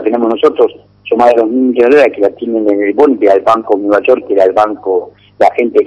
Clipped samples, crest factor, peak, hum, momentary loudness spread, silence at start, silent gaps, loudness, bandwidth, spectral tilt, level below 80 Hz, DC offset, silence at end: 2%; 10 dB; 0 dBFS; 50 Hz at -50 dBFS; 7 LU; 0 s; none; -10 LUFS; 8.6 kHz; -6 dB/octave; -54 dBFS; under 0.1%; 0 s